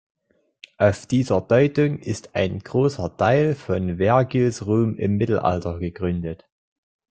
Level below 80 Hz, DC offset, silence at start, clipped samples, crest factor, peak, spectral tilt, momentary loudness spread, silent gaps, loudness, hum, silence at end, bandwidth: -52 dBFS; under 0.1%; 0.8 s; under 0.1%; 18 dB; -2 dBFS; -7.5 dB/octave; 9 LU; none; -21 LUFS; none; 0.75 s; 9.2 kHz